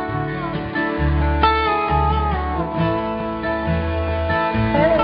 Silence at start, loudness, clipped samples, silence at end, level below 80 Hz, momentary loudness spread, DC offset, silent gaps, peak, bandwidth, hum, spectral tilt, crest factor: 0 s; -20 LUFS; under 0.1%; 0 s; -28 dBFS; 7 LU; under 0.1%; none; -4 dBFS; 5.4 kHz; none; -11.5 dB/octave; 16 dB